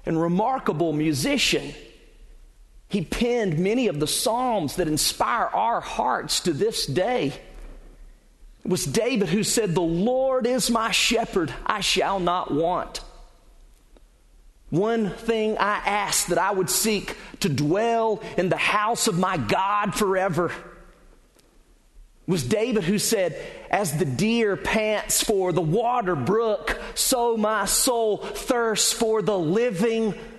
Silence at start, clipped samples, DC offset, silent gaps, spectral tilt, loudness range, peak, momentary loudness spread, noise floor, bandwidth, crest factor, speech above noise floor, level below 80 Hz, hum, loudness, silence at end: 0.05 s; under 0.1%; under 0.1%; none; -3.5 dB/octave; 5 LU; -4 dBFS; 6 LU; -56 dBFS; 12.5 kHz; 20 dB; 33 dB; -48 dBFS; none; -23 LUFS; 0 s